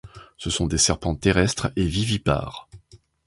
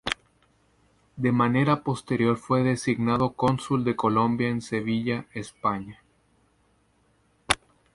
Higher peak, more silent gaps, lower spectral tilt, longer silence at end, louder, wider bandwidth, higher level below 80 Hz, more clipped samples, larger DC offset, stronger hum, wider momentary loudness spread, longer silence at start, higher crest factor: about the same, -4 dBFS vs -4 dBFS; neither; second, -4 dB/octave vs -6 dB/octave; about the same, 0.3 s vs 0.4 s; first, -22 LUFS vs -25 LUFS; about the same, 11.5 kHz vs 11.5 kHz; first, -36 dBFS vs -56 dBFS; neither; neither; neither; first, 12 LU vs 8 LU; about the same, 0.05 s vs 0.05 s; about the same, 20 dB vs 22 dB